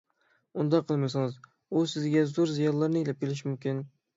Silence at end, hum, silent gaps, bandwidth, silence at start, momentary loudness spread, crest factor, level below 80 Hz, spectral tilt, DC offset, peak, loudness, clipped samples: 0.3 s; none; none; 7.8 kHz; 0.55 s; 8 LU; 16 dB; -74 dBFS; -7 dB/octave; under 0.1%; -12 dBFS; -29 LUFS; under 0.1%